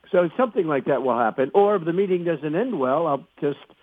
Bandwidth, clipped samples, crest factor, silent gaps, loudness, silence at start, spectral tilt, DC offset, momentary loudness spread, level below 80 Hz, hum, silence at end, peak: 3.9 kHz; under 0.1%; 18 dB; none; -22 LUFS; 0.1 s; -9.5 dB/octave; under 0.1%; 6 LU; -74 dBFS; none; 0.25 s; -4 dBFS